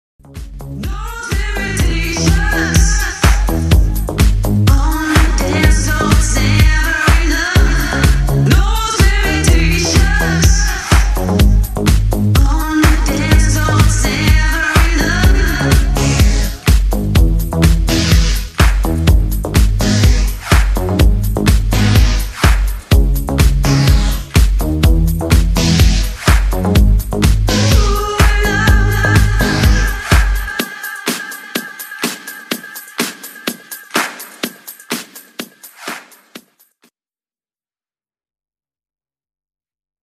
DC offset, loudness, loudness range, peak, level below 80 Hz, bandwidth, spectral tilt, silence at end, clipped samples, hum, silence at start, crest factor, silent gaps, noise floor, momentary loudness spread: under 0.1%; -14 LUFS; 10 LU; 0 dBFS; -14 dBFS; 15 kHz; -4.5 dB/octave; 3.65 s; under 0.1%; none; 0.35 s; 12 dB; none; under -90 dBFS; 12 LU